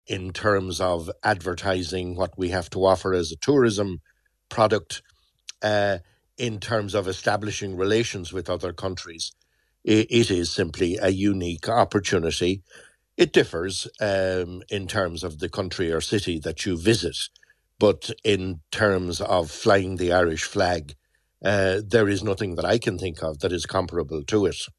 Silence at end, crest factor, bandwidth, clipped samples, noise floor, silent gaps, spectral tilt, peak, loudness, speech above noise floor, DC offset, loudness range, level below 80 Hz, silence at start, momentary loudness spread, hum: 0.1 s; 20 dB; 13 kHz; under 0.1%; -47 dBFS; none; -5 dB/octave; -4 dBFS; -24 LUFS; 23 dB; under 0.1%; 3 LU; -44 dBFS; 0.1 s; 10 LU; none